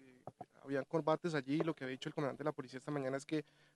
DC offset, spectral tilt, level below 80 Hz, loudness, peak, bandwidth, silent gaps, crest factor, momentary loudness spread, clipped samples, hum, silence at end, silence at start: under 0.1%; -6.5 dB/octave; -84 dBFS; -40 LUFS; -20 dBFS; 12 kHz; none; 20 dB; 16 LU; under 0.1%; none; 0.35 s; 0 s